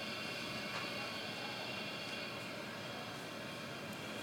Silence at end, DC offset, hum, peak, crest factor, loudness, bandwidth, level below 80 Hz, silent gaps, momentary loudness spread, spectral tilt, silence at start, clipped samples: 0 s; under 0.1%; none; -30 dBFS; 14 dB; -43 LUFS; 17.5 kHz; -74 dBFS; none; 4 LU; -3.5 dB/octave; 0 s; under 0.1%